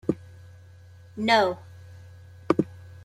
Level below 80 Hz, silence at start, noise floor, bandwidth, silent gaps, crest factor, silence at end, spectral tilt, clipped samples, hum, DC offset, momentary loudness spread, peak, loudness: -62 dBFS; 0.05 s; -49 dBFS; 13.5 kHz; none; 24 dB; 0.15 s; -5.5 dB/octave; under 0.1%; none; under 0.1%; 26 LU; -4 dBFS; -25 LUFS